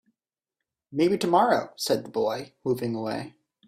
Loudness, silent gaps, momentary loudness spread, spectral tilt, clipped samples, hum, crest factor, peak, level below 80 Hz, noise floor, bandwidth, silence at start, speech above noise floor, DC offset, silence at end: -26 LUFS; none; 12 LU; -5 dB/octave; under 0.1%; none; 20 dB; -8 dBFS; -68 dBFS; -88 dBFS; 16 kHz; 0.9 s; 63 dB; under 0.1%; 0.4 s